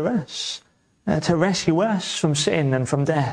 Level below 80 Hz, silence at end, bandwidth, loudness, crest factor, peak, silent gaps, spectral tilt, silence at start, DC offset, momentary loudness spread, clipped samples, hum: -52 dBFS; 0 s; 10.5 kHz; -22 LUFS; 16 dB; -6 dBFS; none; -5 dB/octave; 0 s; under 0.1%; 8 LU; under 0.1%; none